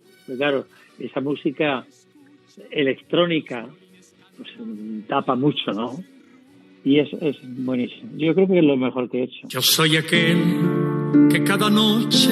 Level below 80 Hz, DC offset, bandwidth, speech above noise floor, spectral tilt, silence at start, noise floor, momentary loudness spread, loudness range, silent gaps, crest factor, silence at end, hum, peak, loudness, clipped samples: -80 dBFS; under 0.1%; 15 kHz; 32 dB; -4.5 dB/octave; 0.3 s; -53 dBFS; 15 LU; 8 LU; none; 18 dB; 0 s; none; -4 dBFS; -20 LUFS; under 0.1%